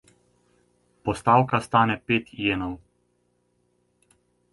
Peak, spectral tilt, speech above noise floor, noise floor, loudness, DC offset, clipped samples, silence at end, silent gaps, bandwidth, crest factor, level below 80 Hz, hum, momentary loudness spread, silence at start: -4 dBFS; -6 dB/octave; 47 dB; -70 dBFS; -23 LUFS; under 0.1%; under 0.1%; 1.75 s; none; 11.5 kHz; 22 dB; -54 dBFS; 60 Hz at -50 dBFS; 13 LU; 1.05 s